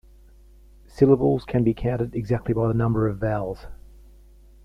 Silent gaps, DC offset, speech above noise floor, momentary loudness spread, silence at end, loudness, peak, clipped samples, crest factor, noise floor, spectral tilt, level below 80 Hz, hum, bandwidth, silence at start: none; under 0.1%; 28 dB; 9 LU; 0.9 s; -23 LUFS; -4 dBFS; under 0.1%; 20 dB; -50 dBFS; -10 dB/octave; -42 dBFS; 50 Hz at -45 dBFS; 6.6 kHz; 0.95 s